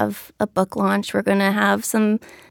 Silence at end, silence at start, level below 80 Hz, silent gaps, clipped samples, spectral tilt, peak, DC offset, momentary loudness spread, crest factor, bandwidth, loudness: 0.25 s; 0 s; -62 dBFS; none; under 0.1%; -5 dB/octave; -4 dBFS; under 0.1%; 8 LU; 18 dB; 18.5 kHz; -20 LUFS